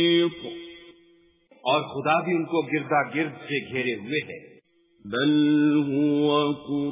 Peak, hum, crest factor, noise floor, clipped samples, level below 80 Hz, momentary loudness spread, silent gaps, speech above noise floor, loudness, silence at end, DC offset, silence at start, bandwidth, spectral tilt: -8 dBFS; none; 16 dB; -59 dBFS; under 0.1%; -68 dBFS; 14 LU; none; 36 dB; -24 LUFS; 0 s; under 0.1%; 0 s; 3.9 kHz; -10 dB/octave